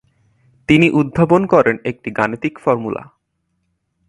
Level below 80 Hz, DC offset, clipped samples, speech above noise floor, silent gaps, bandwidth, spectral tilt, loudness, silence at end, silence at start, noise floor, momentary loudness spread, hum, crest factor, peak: -48 dBFS; under 0.1%; under 0.1%; 54 dB; none; 11 kHz; -7.5 dB/octave; -16 LUFS; 1.05 s; 0.7 s; -69 dBFS; 12 LU; none; 18 dB; 0 dBFS